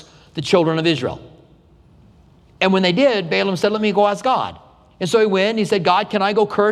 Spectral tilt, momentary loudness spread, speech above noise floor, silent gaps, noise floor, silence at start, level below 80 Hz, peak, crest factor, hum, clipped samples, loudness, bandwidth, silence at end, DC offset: -5.5 dB/octave; 12 LU; 33 dB; none; -50 dBFS; 0.35 s; -54 dBFS; -2 dBFS; 18 dB; none; under 0.1%; -18 LUFS; 13 kHz; 0 s; under 0.1%